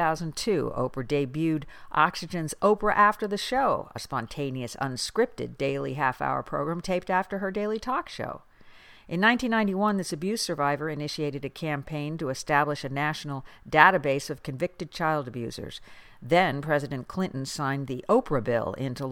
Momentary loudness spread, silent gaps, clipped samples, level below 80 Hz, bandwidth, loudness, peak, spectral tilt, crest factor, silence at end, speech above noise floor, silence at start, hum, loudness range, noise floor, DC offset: 11 LU; none; under 0.1%; -52 dBFS; 17 kHz; -27 LUFS; -2 dBFS; -5 dB/octave; 26 dB; 0 s; 24 dB; 0 s; none; 4 LU; -51 dBFS; under 0.1%